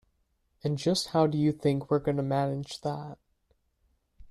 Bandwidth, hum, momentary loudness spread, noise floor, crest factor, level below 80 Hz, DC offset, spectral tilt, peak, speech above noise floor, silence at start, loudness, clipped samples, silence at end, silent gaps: 12.5 kHz; none; 10 LU; -73 dBFS; 18 dB; -62 dBFS; under 0.1%; -6.5 dB/octave; -12 dBFS; 45 dB; 0.65 s; -29 LUFS; under 0.1%; 0 s; none